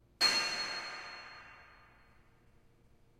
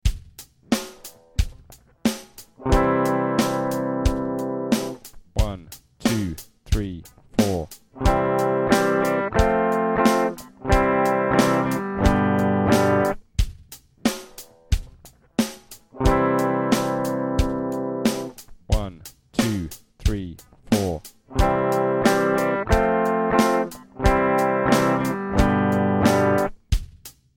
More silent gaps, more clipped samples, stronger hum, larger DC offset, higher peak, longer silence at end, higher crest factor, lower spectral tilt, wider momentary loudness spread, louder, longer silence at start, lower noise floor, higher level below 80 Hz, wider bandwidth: neither; neither; neither; neither; second, -16 dBFS vs -2 dBFS; first, 1.45 s vs 0.25 s; about the same, 24 dB vs 20 dB; second, 0.5 dB/octave vs -6 dB/octave; first, 24 LU vs 12 LU; second, -32 LUFS vs -22 LUFS; first, 0.2 s vs 0.05 s; first, -65 dBFS vs -49 dBFS; second, -70 dBFS vs -32 dBFS; about the same, 16 kHz vs 17 kHz